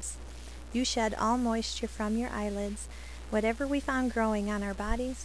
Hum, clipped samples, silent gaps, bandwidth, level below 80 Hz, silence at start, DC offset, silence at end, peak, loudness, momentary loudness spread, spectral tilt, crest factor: none; under 0.1%; none; 11 kHz; -42 dBFS; 0 s; 0.3%; 0 s; -16 dBFS; -31 LUFS; 13 LU; -4 dB/octave; 16 dB